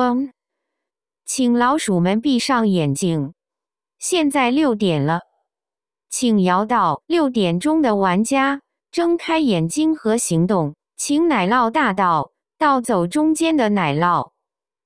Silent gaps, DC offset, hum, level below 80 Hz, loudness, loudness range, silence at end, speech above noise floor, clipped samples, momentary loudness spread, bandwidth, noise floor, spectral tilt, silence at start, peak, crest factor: none; under 0.1%; none; -56 dBFS; -18 LUFS; 2 LU; 0.6 s; over 73 dB; under 0.1%; 8 LU; 11 kHz; under -90 dBFS; -5 dB/octave; 0 s; -2 dBFS; 16 dB